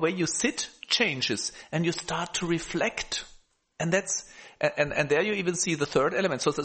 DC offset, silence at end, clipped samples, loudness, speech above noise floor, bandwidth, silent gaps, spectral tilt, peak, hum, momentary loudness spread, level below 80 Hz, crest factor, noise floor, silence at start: under 0.1%; 0 s; under 0.1%; -27 LUFS; 26 dB; 8.8 kHz; none; -3.5 dB/octave; -10 dBFS; none; 7 LU; -56 dBFS; 18 dB; -53 dBFS; 0 s